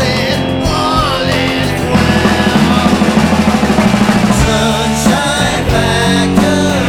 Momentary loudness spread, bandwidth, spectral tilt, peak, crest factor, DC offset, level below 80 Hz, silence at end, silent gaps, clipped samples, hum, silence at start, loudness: 3 LU; 16.5 kHz; -5 dB/octave; 0 dBFS; 10 dB; under 0.1%; -26 dBFS; 0 s; none; under 0.1%; none; 0 s; -11 LUFS